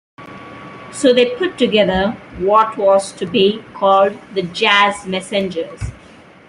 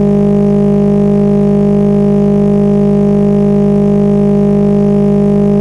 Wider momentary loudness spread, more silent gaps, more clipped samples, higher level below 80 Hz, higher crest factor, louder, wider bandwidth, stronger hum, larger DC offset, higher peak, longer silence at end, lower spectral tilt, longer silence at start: first, 17 LU vs 0 LU; neither; neither; second, -44 dBFS vs -30 dBFS; first, 16 dB vs 6 dB; second, -15 LUFS vs -9 LUFS; first, 11.5 kHz vs 3.7 kHz; second, none vs 50 Hz at -30 dBFS; second, under 0.1% vs 1%; about the same, 0 dBFS vs -2 dBFS; first, 0.55 s vs 0 s; second, -4.5 dB/octave vs -10.5 dB/octave; first, 0.2 s vs 0 s